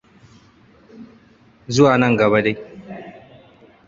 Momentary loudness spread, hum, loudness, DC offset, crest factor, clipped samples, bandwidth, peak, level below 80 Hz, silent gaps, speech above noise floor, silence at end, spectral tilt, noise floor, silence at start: 22 LU; none; -16 LUFS; under 0.1%; 20 dB; under 0.1%; 7.6 kHz; -2 dBFS; -54 dBFS; none; 36 dB; 0.75 s; -6 dB/octave; -51 dBFS; 1 s